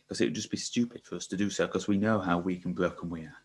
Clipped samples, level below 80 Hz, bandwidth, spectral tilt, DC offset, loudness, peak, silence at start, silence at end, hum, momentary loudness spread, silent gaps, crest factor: under 0.1%; -58 dBFS; 11.5 kHz; -5 dB/octave; under 0.1%; -31 LUFS; -10 dBFS; 0.1 s; 0.05 s; none; 9 LU; none; 20 dB